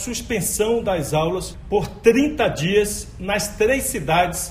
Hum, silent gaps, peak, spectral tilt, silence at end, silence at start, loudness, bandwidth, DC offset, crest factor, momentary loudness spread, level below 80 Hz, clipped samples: none; none; -2 dBFS; -4 dB/octave; 0 s; 0 s; -20 LUFS; 15.5 kHz; under 0.1%; 18 dB; 7 LU; -38 dBFS; under 0.1%